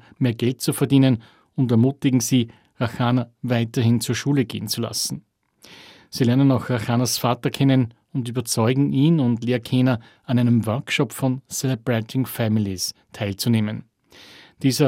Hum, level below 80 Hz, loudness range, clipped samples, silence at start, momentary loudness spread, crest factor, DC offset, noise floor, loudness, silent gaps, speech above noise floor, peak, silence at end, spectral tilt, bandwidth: none; -60 dBFS; 3 LU; under 0.1%; 0.2 s; 9 LU; 16 dB; under 0.1%; -49 dBFS; -21 LUFS; none; 29 dB; -4 dBFS; 0 s; -5.5 dB/octave; 16.5 kHz